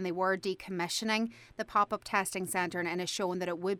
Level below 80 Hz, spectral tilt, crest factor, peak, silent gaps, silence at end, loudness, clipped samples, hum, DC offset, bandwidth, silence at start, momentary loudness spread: -68 dBFS; -3.5 dB/octave; 20 dB; -14 dBFS; none; 0 s; -33 LUFS; under 0.1%; none; under 0.1%; 18 kHz; 0 s; 5 LU